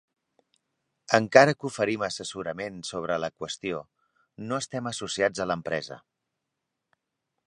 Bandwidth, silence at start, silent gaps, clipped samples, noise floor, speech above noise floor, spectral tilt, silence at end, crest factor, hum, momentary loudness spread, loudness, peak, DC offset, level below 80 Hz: 11 kHz; 1.1 s; none; under 0.1%; -83 dBFS; 57 dB; -4 dB/octave; 1.5 s; 28 dB; none; 15 LU; -27 LUFS; 0 dBFS; under 0.1%; -66 dBFS